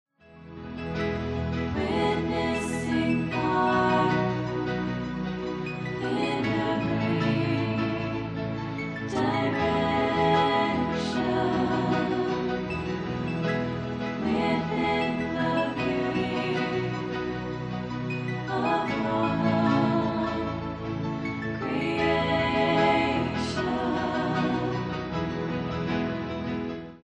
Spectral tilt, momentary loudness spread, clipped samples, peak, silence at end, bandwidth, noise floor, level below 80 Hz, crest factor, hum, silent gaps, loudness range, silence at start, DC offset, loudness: -6.5 dB/octave; 9 LU; under 0.1%; -10 dBFS; 0.05 s; 11.5 kHz; -48 dBFS; -48 dBFS; 18 dB; none; none; 3 LU; 0.3 s; under 0.1%; -27 LUFS